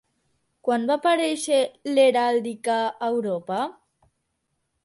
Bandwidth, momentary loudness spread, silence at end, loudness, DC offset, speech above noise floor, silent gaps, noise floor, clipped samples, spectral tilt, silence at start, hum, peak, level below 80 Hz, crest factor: 11.5 kHz; 9 LU; 1.15 s; -23 LUFS; under 0.1%; 53 dB; none; -76 dBFS; under 0.1%; -3.5 dB/octave; 0.65 s; none; -8 dBFS; -74 dBFS; 16 dB